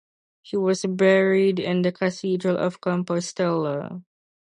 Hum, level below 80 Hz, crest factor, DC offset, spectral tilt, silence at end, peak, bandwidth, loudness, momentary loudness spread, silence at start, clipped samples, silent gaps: none; -68 dBFS; 18 dB; under 0.1%; -6 dB/octave; 0.55 s; -6 dBFS; 10 kHz; -23 LUFS; 11 LU; 0.45 s; under 0.1%; none